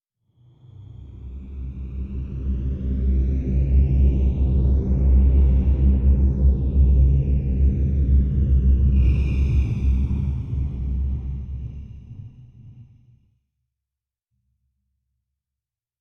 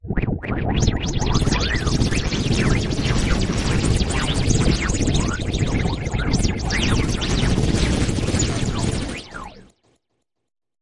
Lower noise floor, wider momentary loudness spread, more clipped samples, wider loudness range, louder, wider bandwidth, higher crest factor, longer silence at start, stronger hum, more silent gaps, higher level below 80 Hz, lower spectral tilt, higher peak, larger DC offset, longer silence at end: first, -88 dBFS vs -76 dBFS; first, 17 LU vs 5 LU; neither; first, 12 LU vs 2 LU; about the same, -21 LUFS vs -21 LUFS; second, 3 kHz vs 11.5 kHz; about the same, 14 dB vs 16 dB; first, 0.8 s vs 0.05 s; neither; neither; about the same, -22 dBFS vs -26 dBFS; first, -11 dB/octave vs -5 dB/octave; second, -8 dBFS vs -4 dBFS; neither; first, 3.2 s vs 1.2 s